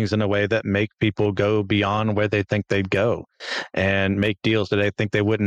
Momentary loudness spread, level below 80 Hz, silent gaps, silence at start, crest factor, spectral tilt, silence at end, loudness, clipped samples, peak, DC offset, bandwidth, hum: 3 LU; -52 dBFS; none; 0 s; 14 dB; -7 dB/octave; 0 s; -22 LUFS; under 0.1%; -8 dBFS; under 0.1%; 8.6 kHz; none